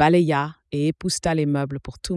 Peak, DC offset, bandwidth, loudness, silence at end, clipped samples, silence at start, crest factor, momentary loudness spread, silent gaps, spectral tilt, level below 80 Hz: -6 dBFS; under 0.1%; 12 kHz; -23 LUFS; 0 s; under 0.1%; 0 s; 14 dB; 10 LU; none; -5.5 dB/octave; -46 dBFS